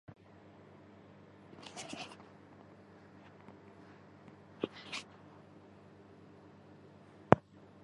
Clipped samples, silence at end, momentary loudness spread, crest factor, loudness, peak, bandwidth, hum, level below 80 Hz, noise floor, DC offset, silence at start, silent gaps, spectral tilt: under 0.1%; 0 s; 20 LU; 40 dB; -36 LUFS; -2 dBFS; 11 kHz; none; -66 dBFS; -58 dBFS; under 0.1%; 0.1 s; none; -6 dB/octave